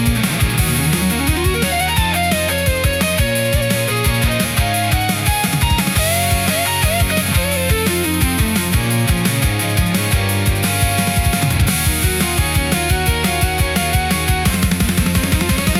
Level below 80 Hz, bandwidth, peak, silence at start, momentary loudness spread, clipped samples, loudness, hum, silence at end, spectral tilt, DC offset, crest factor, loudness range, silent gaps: -24 dBFS; 17 kHz; -2 dBFS; 0 s; 1 LU; under 0.1%; -16 LUFS; none; 0 s; -4 dB/octave; under 0.1%; 14 dB; 1 LU; none